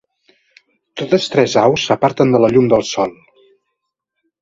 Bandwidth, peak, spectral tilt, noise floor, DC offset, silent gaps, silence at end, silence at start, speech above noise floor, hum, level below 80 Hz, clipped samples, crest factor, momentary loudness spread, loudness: 7.8 kHz; 0 dBFS; -5.5 dB/octave; -76 dBFS; under 0.1%; none; 1.3 s; 0.95 s; 62 dB; none; -52 dBFS; under 0.1%; 16 dB; 10 LU; -14 LUFS